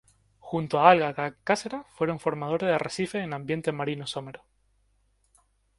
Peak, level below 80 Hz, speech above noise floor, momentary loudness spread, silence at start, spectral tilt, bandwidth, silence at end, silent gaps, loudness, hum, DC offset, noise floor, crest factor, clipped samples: -4 dBFS; -62 dBFS; 42 dB; 14 LU; 0.45 s; -5.5 dB/octave; 11.5 kHz; 1.4 s; none; -27 LUFS; none; under 0.1%; -68 dBFS; 24 dB; under 0.1%